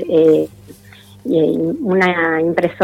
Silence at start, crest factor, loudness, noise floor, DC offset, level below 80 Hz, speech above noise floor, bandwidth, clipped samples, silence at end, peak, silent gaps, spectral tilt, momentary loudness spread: 0 s; 12 dB; -15 LUFS; -42 dBFS; under 0.1%; -56 dBFS; 28 dB; 13 kHz; under 0.1%; 0 s; -4 dBFS; none; -7.5 dB/octave; 7 LU